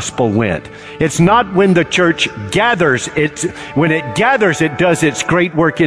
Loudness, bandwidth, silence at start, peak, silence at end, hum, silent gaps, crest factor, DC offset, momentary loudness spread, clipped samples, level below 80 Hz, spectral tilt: -14 LUFS; 11 kHz; 0 s; -2 dBFS; 0 s; none; none; 12 dB; 0.2%; 7 LU; under 0.1%; -42 dBFS; -5 dB/octave